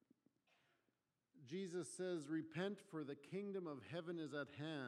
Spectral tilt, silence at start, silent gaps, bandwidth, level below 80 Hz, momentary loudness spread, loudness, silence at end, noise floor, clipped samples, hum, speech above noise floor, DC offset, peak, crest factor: -5.5 dB/octave; 1.35 s; none; 13 kHz; under -90 dBFS; 5 LU; -49 LUFS; 0 s; -89 dBFS; under 0.1%; none; 40 dB; under 0.1%; -30 dBFS; 18 dB